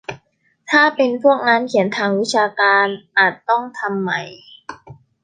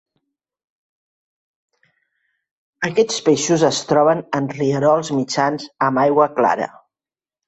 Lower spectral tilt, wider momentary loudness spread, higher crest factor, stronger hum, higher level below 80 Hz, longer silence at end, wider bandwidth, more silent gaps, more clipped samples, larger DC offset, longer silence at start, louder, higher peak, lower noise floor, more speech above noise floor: about the same, -4.5 dB/octave vs -4.5 dB/octave; first, 20 LU vs 6 LU; about the same, 18 dB vs 18 dB; neither; about the same, -64 dBFS vs -62 dBFS; second, 0.3 s vs 0.8 s; first, 9.6 kHz vs 8.4 kHz; neither; neither; neither; second, 0.1 s vs 2.8 s; about the same, -16 LUFS vs -18 LUFS; about the same, 0 dBFS vs -2 dBFS; second, -60 dBFS vs under -90 dBFS; second, 43 dB vs over 73 dB